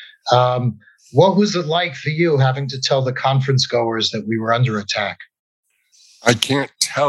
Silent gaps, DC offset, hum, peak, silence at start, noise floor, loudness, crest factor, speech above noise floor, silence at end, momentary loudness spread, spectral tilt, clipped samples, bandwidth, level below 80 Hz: 5.39-5.63 s; under 0.1%; none; 0 dBFS; 0 s; -53 dBFS; -18 LUFS; 18 dB; 36 dB; 0 s; 6 LU; -5 dB/octave; under 0.1%; 12.5 kHz; -68 dBFS